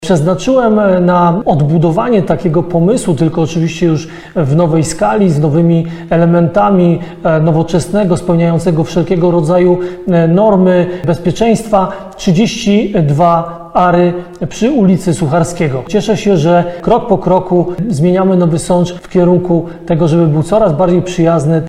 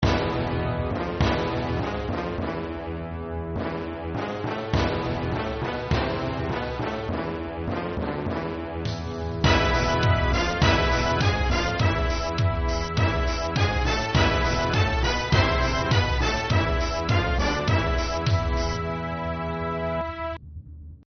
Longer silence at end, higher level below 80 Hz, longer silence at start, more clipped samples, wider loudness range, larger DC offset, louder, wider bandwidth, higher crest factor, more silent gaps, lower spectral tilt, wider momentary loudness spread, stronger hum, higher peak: about the same, 0 s vs 0.1 s; about the same, -34 dBFS vs -32 dBFS; about the same, 0 s vs 0 s; neither; second, 1 LU vs 6 LU; neither; first, -11 LUFS vs -25 LUFS; first, 11.5 kHz vs 6.6 kHz; second, 10 dB vs 18 dB; neither; first, -7.5 dB/octave vs -4.5 dB/octave; second, 5 LU vs 9 LU; neither; first, 0 dBFS vs -8 dBFS